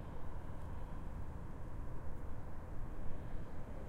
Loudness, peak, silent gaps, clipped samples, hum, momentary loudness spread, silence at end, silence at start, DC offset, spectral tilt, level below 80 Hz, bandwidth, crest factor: -50 LUFS; -26 dBFS; none; under 0.1%; none; 1 LU; 0 s; 0 s; under 0.1%; -8 dB/octave; -46 dBFS; 3.6 kHz; 14 dB